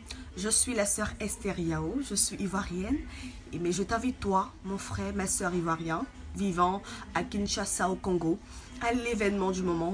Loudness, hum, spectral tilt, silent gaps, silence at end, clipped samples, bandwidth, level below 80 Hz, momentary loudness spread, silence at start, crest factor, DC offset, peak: -31 LUFS; none; -4 dB/octave; none; 0 s; under 0.1%; 10.5 kHz; -46 dBFS; 9 LU; 0 s; 18 dB; under 0.1%; -12 dBFS